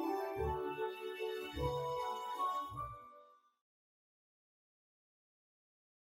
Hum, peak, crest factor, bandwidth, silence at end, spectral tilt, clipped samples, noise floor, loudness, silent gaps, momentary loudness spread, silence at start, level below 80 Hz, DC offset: none; -24 dBFS; 18 dB; 16 kHz; 2.85 s; -6 dB/octave; under 0.1%; -64 dBFS; -41 LUFS; none; 8 LU; 0 s; -58 dBFS; under 0.1%